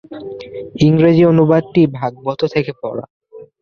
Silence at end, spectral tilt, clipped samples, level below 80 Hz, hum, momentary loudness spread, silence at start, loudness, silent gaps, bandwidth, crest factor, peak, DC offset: 0.2 s; -8.5 dB/octave; under 0.1%; -50 dBFS; none; 19 LU; 0.1 s; -14 LUFS; 3.10-3.20 s; 6.8 kHz; 14 dB; 0 dBFS; under 0.1%